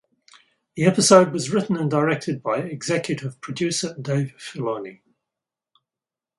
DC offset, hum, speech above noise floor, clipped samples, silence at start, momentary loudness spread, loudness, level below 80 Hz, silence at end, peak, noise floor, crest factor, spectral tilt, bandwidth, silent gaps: under 0.1%; none; 68 dB; under 0.1%; 0.75 s; 16 LU; -22 LUFS; -64 dBFS; 1.45 s; 0 dBFS; -90 dBFS; 22 dB; -4.5 dB/octave; 11.5 kHz; none